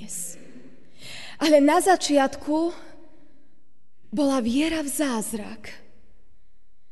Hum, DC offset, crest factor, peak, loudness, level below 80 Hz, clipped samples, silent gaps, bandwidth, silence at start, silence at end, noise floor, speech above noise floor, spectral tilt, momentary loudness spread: none; 1%; 20 dB; -6 dBFS; -23 LUFS; -56 dBFS; under 0.1%; none; 12 kHz; 0 s; 1.15 s; -69 dBFS; 47 dB; -3 dB/octave; 22 LU